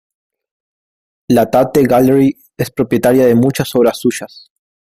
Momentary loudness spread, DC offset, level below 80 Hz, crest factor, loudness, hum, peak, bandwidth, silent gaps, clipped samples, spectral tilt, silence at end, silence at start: 11 LU; under 0.1%; -48 dBFS; 14 dB; -13 LUFS; none; 0 dBFS; 16 kHz; none; under 0.1%; -6.5 dB/octave; 0.6 s; 1.3 s